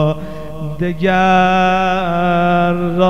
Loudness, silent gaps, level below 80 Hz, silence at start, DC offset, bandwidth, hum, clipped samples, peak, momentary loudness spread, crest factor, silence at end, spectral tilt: -14 LUFS; none; -38 dBFS; 0 s; 4%; 7.2 kHz; none; under 0.1%; -2 dBFS; 14 LU; 12 dB; 0 s; -7 dB/octave